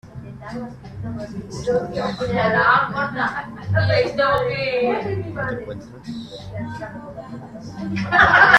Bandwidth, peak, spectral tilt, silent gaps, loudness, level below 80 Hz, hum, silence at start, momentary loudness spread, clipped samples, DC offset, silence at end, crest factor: 10.5 kHz; 0 dBFS; -6 dB/octave; none; -20 LUFS; -46 dBFS; none; 0.05 s; 19 LU; under 0.1%; under 0.1%; 0 s; 20 dB